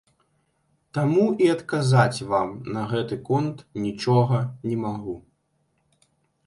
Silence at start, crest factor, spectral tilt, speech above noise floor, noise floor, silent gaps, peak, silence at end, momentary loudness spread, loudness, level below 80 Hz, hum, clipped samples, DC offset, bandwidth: 0.95 s; 20 dB; -7 dB/octave; 47 dB; -70 dBFS; none; -4 dBFS; 1.25 s; 11 LU; -24 LUFS; -60 dBFS; none; under 0.1%; under 0.1%; 11.5 kHz